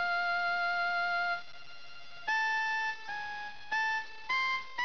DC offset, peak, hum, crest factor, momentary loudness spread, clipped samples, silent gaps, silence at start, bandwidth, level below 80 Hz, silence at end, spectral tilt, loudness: 0.5%; -24 dBFS; none; 10 dB; 16 LU; under 0.1%; none; 0 s; 5.4 kHz; -70 dBFS; 0 s; -0.5 dB/octave; -32 LUFS